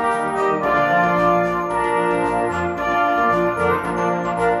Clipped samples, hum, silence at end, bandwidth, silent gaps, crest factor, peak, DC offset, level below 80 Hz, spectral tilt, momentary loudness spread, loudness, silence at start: under 0.1%; none; 0 s; 13.5 kHz; none; 12 dB; -6 dBFS; under 0.1%; -46 dBFS; -6 dB/octave; 4 LU; -19 LUFS; 0 s